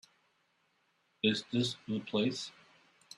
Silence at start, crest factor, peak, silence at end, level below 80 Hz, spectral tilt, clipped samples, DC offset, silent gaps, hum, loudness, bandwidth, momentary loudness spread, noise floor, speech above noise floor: 1.25 s; 22 dB; -14 dBFS; 0.65 s; -74 dBFS; -5 dB/octave; under 0.1%; under 0.1%; none; none; -34 LUFS; 12 kHz; 9 LU; -75 dBFS; 42 dB